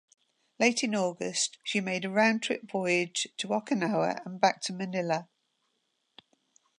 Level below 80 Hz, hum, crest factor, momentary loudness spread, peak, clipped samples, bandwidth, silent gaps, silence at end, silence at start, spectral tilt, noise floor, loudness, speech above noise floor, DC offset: -82 dBFS; none; 22 dB; 7 LU; -10 dBFS; under 0.1%; 11 kHz; none; 1.55 s; 0.6 s; -3.5 dB/octave; -78 dBFS; -29 LUFS; 48 dB; under 0.1%